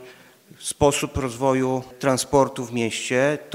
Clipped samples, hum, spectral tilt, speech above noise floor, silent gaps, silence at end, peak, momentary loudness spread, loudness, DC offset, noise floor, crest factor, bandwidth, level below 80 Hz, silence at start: under 0.1%; none; -4.5 dB/octave; 26 dB; none; 0 s; -4 dBFS; 6 LU; -22 LUFS; under 0.1%; -48 dBFS; 20 dB; 16 kHz; -46 dBFS; 0 s